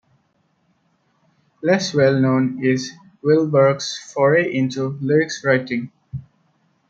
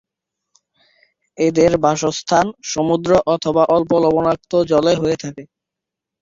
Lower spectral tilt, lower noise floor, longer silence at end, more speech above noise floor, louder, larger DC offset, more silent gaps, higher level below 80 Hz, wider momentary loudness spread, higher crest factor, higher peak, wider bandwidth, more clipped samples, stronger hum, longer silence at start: about the same, -6 dB/octave vs -5.5 dB/octave; second, -65 dBFS vs -84 dBFS; about the same, 0.7 s vs 0.75 s; second, 47 dB vs 68 dB; second, -19 LUFS vs -16 LUFS; neither; neither; second, -62 dBFS vs -50 dBFS; first, 12 LU vs 7 LU; about the same, 18 dB vs 16 dB; about the same, -2 dBFS vs -2 dBFS; about the same, 7.8 kHz vs 7.6 kHz; neither; neither; first, 1.65 s vs 1.4 s